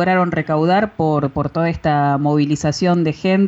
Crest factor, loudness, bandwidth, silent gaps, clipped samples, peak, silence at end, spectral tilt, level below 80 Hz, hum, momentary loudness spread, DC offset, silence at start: 10 dB; -17 LUFS; 8 kHz; none; under 0.1%; -6 dBFS; 0 s; -7 dB/octave; -44 dBFS; none; 3 LU; under 0.1%; 0 s